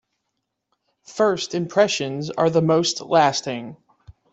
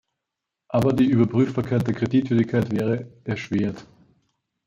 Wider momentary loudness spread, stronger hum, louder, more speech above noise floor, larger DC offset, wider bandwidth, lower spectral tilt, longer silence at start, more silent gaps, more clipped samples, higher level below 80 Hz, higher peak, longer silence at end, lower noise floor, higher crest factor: first, 13 LU vs 10 LU; neither; first, -20 LUFS vs -23 LUFS; second, 58 dB vs 63 dB; neither; second, 8.2 kHz vs 14.5 kHz; second, -4.5 dB/octave vs -8.5 dB/octave; first, 1.1 s vs 0.7 s; neither; neither; second, -62 dBFS vs -56 dBFS; about the same, -4 dBFS vs -6 dBFS; second, 0.2 s vs 0.85 s; second, -78 dBFS vs -84 dBFS; about the same, 18 dB vs 18 dB